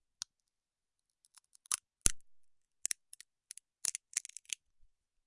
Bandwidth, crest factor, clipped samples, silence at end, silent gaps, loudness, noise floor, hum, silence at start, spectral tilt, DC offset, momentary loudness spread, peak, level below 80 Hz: 11.5 kHz; 36 dB; under 0.1%; 1.05 s; none; -38 LUFS; under -90 dBFS; none; 1.7 s; 0 dB/octave; under 0.1%; 20 LU; -6 dBFS; -56 dBFS